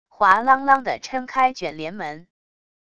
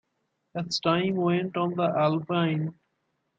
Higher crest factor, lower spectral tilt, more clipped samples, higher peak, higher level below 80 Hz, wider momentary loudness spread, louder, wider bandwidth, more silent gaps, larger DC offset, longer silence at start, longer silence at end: about the same, 20 dB vs 18 dB; second, -4 dB/octave vs -6.5 dB/octave; neither; first, -2 dBFS vs -8 dBFS; first, -60 dBFS vs -70 dBFS; first, 14 LU vs 9 LU; first, -20 LUFS vs -27 LUFS; about the same, 8.6 kHz vs 8 kHz; neither; first, 0.5% vs under 0.1%; second, 0.2 s vs 0.55 s; first, 0.8 s vs 0.65 s